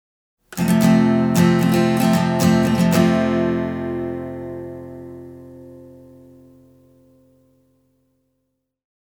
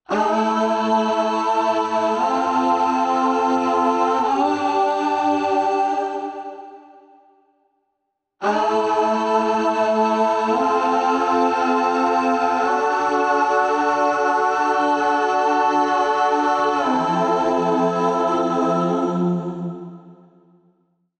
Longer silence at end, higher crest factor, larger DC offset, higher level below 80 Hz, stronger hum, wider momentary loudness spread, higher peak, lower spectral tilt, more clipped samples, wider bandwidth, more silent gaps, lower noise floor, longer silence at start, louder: first, 3.15 s vs 1.05 s; first, 18 dB vs 12 dB; neither; first, -50 dBFS vs -62 dBFS; neither; first, 21 LU vs 3 LU; first, -2 dBFS vs -6 dBFS; about the same, -6.5 dB/octave vs -5.5 dB/octave; neither; first, over 20 kHz vs 9 kHz; neither; about the same, -74 dBFS vs -76 dBFS; first, 0.5 s vs 0.1 s; about the same, -17 LUFS vs -19 LUFS